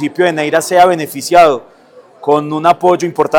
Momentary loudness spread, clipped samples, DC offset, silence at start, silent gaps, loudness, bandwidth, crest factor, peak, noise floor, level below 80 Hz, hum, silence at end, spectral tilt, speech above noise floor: 7 LU; under 0.1%; under 0.1%; 0 s; none; -11 LUFS; 19 kHz; 12 dB; 0 dBFS; -41 dBFS; -52 dBFS; none; 0 s; -4.5 dB/octave; 30 dB